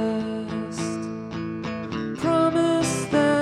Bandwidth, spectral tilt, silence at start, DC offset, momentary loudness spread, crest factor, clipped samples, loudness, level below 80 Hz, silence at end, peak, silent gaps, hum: 13 kHz; -5.5 dB/octave; 0 s; under 0.1%; 11 LU; 18 dB; under 0.1%; -25 LUFS; -54 dBFS; 0 s; -6 dBFS; none; none